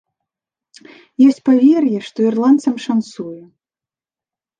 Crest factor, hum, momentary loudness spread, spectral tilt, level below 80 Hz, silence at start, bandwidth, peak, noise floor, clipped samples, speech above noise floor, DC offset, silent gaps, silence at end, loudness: 14 dB; none; 18 LU; -6.5 dB/octave; -72 dBFS; 1.2 s; 9.2 kHz; -2 dBFS; under -90 dBFS; under 0.1%; over 76 dB; under 0.1%; none; 1.2 s; -14 LUFS